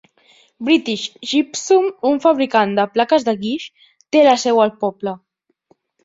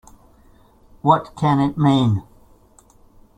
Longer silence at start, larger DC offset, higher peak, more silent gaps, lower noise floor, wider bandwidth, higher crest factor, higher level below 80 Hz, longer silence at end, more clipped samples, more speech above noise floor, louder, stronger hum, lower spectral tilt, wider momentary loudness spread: second, 0.6 s vs 1.05 s; neither; about the same, -2 dBFS vs -2 dBFS; neither; first, -60 dBFS vs -52 dBFS; second, 7.8 kHz vs 9.4 kHz; about the same, 16 dB vs 18 dB; second, -64 dBFS vs -50 dBFS; second, 0.85 s vs 1.15 s; neither; first, 43 dB vs 35 dB; about the same, -17 LUFS vs -19 LUFS; neither; second, -4 dB/octave vs -8 dB/octave; first, 13 LU vs 6 LU